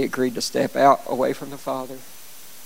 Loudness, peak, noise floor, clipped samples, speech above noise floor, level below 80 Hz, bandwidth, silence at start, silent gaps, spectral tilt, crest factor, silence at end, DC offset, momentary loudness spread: -22 LUFS; -2 dBFS; -44 dBFS; under 0.1%; 22 dB; -58 dBFS; 17 kHz; 0 s; none; -4 dB/octave; 20 dB; 0 s; 0.9%; 23 LU